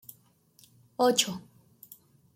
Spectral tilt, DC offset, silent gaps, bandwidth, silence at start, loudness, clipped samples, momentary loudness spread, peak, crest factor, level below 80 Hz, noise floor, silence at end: -2.5 dB/octave; under 0.1%; none; 16.5 kHz; 1 s; -26 LUFS; under 0.1%; 27 LU; -10 dBFS; 24 dB; -76 dBFS; -63 dBFS; 0.95 s